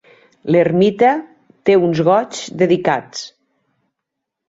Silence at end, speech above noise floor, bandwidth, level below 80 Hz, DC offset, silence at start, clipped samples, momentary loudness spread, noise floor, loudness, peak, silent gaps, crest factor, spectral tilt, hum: 1.2 s; 64 dB; 8 kHz; -58 dBFS; under 0.1%; 0.45 s; under 0.1%; 16 LU; -79 dBFS; -15 LUFS; -2 dBFS; none; 16 dB; -6 dB/octave; none